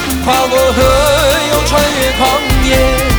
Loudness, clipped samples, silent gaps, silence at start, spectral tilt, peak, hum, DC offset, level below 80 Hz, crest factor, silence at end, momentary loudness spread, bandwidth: -10 LUFS; under 0.1%; none; 0 s; -4 dB/octave; 0 dBFS; none; under 0.1%; -18 dBFS; 10 dB; 0 s; 2 LU; over 20 kHz